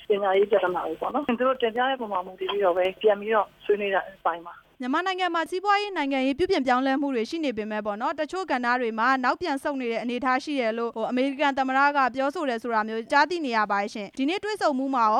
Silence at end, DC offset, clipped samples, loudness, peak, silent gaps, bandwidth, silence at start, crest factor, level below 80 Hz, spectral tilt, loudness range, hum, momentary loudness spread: 0 s; under 0.1%; under 0.1%; -25 LUFS; -6 dBFS; none; 12.5 kHz; 0 s; 18 dB; -62 dBFS; -4.5 dB/octave; 2 LU; none; 7 LU